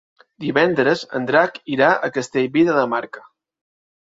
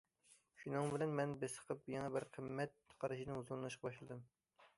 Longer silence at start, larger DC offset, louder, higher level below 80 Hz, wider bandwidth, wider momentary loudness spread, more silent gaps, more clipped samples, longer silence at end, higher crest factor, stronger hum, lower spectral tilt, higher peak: about the same, 0.4 s vs 0.3 s; neither; first, -19 LUFS vs -45 LUFS; first, -64 dBFS vs -78 dBFS; second, 7.8 kHz vs 11.5 kHz; about the same, 9 LU vs 10 LU; neither; neither; first, 1 s vs 0.1 s; about the same, 18 dB vs 18 dB; neither; about the same, -5.5 dB/octave vs -6 dB/octave; first, -2 dBFS vs -28 dBFS